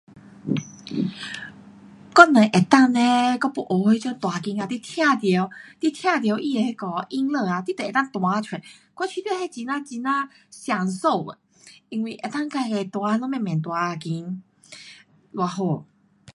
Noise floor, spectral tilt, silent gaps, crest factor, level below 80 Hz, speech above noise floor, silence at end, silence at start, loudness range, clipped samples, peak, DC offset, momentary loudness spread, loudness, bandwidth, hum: -49 dBFS; -5.5 dB/octave; none; 22 dB; -70 dBFS; 26 dB; 0.5 s; 0.15 s; 9 LU; under 0.1%; 0 dBFS; under 0.1%; 17 LU; -22 LUFS; 11.5 kHz; none